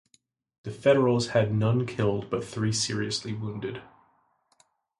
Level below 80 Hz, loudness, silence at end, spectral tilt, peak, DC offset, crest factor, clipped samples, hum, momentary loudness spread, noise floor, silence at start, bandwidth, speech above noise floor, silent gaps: -60 dBFS; -27 LUFS; 1.15 s; -5.5 dB/octave; -10 dBFS; under 0.1%; 18 dB; under 0.1%; none; 14 LU; -68 dBFS; 0.65 s; 11.5 kHz; 42 dB; none